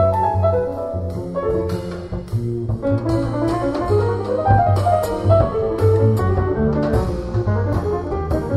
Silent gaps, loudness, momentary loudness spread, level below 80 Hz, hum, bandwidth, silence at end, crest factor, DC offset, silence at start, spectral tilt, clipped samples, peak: none; -19 LUFS; 9 LU; -32 dBFS; none; 12.5 kHz; 0 s; 16 dB; under 0.1%; 0 s; -8.5 dB/octave; under 0.1%; -2 dBFS